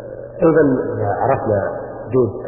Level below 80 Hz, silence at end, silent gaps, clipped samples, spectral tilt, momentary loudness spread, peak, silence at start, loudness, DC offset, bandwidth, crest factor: -44 dBFS; 0 s; none; under 0.1%; -14.5 dB/octave; 11 LU; -2 dBFS; 0 s; -17 LUFS; under 0.1%; 2.9 kHz; 16 dB